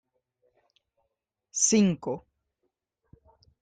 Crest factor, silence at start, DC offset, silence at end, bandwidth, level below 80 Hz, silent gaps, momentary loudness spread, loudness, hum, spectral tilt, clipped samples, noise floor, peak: 22 dB; 1.55 s; under 0.1%; 1.45 s; 9.6 kHz; -66 dBFS; none; 15 LU; -25 LUFS; none; -4 dB/octave; under 0.1%; -83 dBFS; -10 dBFS